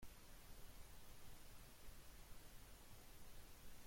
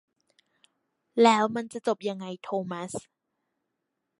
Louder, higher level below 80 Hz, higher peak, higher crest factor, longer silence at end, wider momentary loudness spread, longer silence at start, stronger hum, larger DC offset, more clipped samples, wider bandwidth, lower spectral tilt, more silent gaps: second, -63 LUFS vs -27 LUFS; first, -64 dBFS vs -76 dBFS; second, -44 dBFS vs -6 dBFS; second, 12 dB vs 24 dB; second, 0 s vs 1.2 s; second, 0 LU vs 16 LU; second, 0 s vs 1.15 s; neither; neither; neither; first, 16.5 kHz vs 11.5 kHz; second, -3 dB/octave vs -4.5 dB/octave; neither